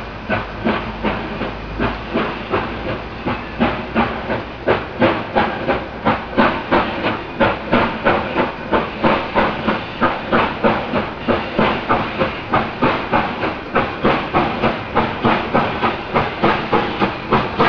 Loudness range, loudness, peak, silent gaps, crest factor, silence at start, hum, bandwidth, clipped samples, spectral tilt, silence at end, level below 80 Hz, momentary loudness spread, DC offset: 4 LU; -19 LUFS; 0 dBFS; none; 18 dB; 0 s; none; 5.4 kHz; under 0.1%; -7.5 dB/octave; 0 s; -36 dBFS; 6 LU; 0.3%